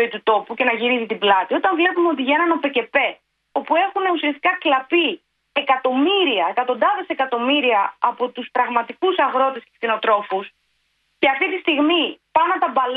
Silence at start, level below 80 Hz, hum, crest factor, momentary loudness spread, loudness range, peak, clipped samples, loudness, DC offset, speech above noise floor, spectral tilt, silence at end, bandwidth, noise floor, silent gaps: 0 s; -70 dBFS; none; 16 dB; 6 LU; 2 LU; -2 dBFS; under 0.1%; -19 LUFS; under 0.1%; 48 dB; -6 dB/octave; 0 s; 4.7 kHz; -67 dBFS; none